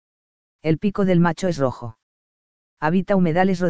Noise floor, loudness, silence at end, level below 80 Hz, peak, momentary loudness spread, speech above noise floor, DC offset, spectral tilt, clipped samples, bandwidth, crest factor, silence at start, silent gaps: under -90 dBFS; -21 LUFS; 0 s; -50 dBFS; -4 dBFS; 10 LU; over 71 dB; under 0.1%; -7.5 dB/octave; under 0.1%; 8 kHz; 16 dB; 0.6 s; 2.03-2.77 s